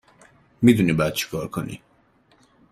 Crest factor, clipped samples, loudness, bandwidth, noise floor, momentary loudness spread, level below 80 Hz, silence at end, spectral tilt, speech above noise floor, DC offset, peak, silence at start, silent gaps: 22 dB; under 0.1%; -21 LUFS; 16 kHz; -60 dBFS; 17 LU; -52 dBFS; 0.95 s; -6 dB/octave; 39 dB; under 0.1%; -2 dBFS; 0.6 s; none